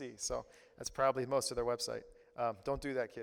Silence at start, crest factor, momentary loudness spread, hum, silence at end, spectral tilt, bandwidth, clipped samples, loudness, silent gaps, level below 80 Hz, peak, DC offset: 0 s; 20 dB; 12 LU; none; 0 s; -3.5 dB/octave; 18 kHz; under 0.1%; -38 LUFS; none; -58 dBFS; -20 dBFS; under 0.1%